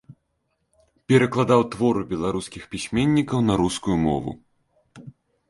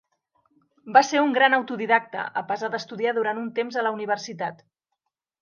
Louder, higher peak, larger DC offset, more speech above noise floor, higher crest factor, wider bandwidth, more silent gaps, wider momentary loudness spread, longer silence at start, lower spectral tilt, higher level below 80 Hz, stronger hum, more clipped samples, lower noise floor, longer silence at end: about the same, -22 LUFS vs -23 LUFS; about the same, -2 dBFS vs -2 dBFS; neither; second, 52 dB vs 58 dB; about the same, 20 dB vs 24 dB; first, 11.5 kHz vs 7.2 kHz; neither; about the same, 12 LU vs 11 LU; second, 0.1 s vs 0.85 s; first, -6.5 dB/octave vs -3.5 dB/octave; first, -48 dBFS vs -82 dBFS; neither; neither; second, -73 dBFS vs -81 dBFS; second, 0.4 s vs 0.85 s